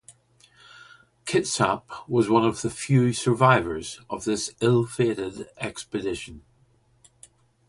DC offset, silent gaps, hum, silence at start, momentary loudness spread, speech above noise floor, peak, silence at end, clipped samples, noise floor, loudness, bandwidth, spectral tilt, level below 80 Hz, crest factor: under 0.1%; none; none; 0.1 s; 14 LU; 38 dB; -4 dBFS; 1.3 s; under 0.1%; -62 dBFS; -24 LUFS; 11.5 kHz; -5.5 dB/octave; -56 dBFS; 22 dB